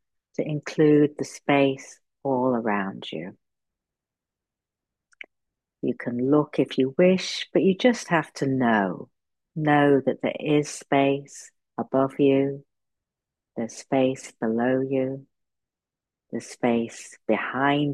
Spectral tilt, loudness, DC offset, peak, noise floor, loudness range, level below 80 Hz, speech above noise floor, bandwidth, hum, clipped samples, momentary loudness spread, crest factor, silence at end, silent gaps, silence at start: -6 dB/octave; -24 LUFS; under 0.1%; -6 dBFS; -89 dBFS; 8 LU; -72 dBFS; 66 dB; 12 kHz; none; under 0.1%; 16 LU; 18 dB; 0 s; none; 0.4 s